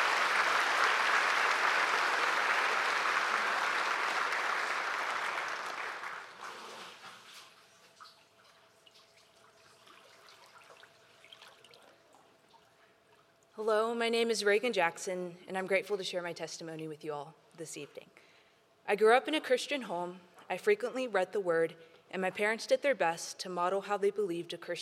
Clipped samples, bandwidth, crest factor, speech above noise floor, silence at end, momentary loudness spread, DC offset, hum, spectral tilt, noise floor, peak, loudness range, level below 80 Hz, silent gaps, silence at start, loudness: under 0.1%; 15.5 kHz; 22 dB; 33 dB; 0 s; 18 LU; under 0.1%; none; -2.5 dB/octave; -66 dBFS; -12 dBFS; 12 LU; under -90 dBFS; none; 0 s; -31 LUFS